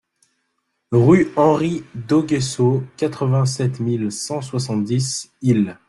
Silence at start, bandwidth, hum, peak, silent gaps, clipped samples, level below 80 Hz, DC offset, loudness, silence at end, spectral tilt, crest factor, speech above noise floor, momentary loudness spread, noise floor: 0.9 s; 12 kHz; none; -2 dBFS; none; under 0.1%; -56 dBFS; under 0.1%; -19 LUFS; 0.15 s; -6.5 dB/octave; 16 dB; 54 dB; 10 LU; -72 dBFS